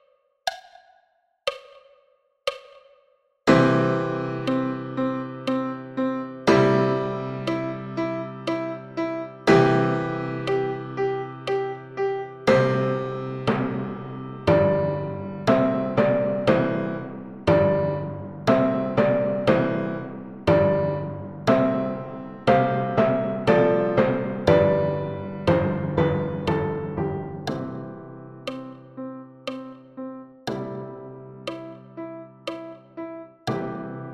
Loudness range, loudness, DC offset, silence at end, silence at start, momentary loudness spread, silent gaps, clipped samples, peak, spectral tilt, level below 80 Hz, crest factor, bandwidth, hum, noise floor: 14 LU; -24 LUFS; under 0.1%; 0 s; 0.45 s; 17 LU; none; under 0.1%; -4 dBFS; -7.5 dB/octave; -52 dBFS; 20 dB; 11.5 kHz; none; -65 dBFS